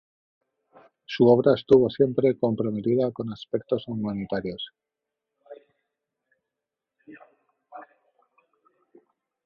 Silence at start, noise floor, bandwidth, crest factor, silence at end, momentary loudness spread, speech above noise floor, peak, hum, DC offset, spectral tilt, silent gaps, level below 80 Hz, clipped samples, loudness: 1.1 s; -87 dBFS; 6.6 kHz; 22 dB; 1.6 s; 18 LU; 64 dB; -4 dBFS; none; under 0.1%; -9 dB/octave; none; -62 dBFS; under 0.1%; -23 LUFS